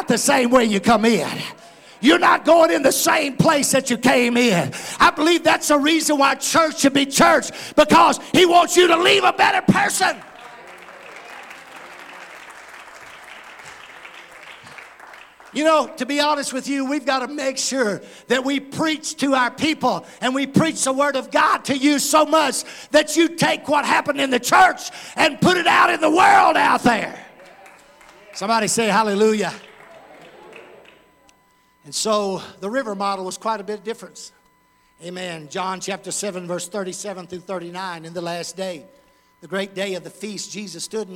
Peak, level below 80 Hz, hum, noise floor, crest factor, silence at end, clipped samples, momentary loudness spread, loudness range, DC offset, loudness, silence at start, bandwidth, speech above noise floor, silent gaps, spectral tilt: -4 dBFS; -56 dBFS; none; -59 dBFS; 16 dB; 0 s; under 0.1%; 24 LU; 14 LU; under 0.1%; -18 LUFS; 0 s; 17 kHz; 40 dB; none; -3 dB/octave